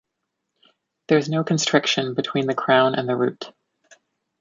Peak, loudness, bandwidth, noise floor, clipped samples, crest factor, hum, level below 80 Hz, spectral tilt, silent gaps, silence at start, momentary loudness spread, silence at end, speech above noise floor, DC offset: -2 dBFS; -21 LUFS; 7.8 kHz; -79 dBFS; under 0.1%; 20 dB; none; -70 dBFS; -4.5 dB/octave; none; 1.1 s; 7 LU; 0.9 s; 59 dB; under 0.1%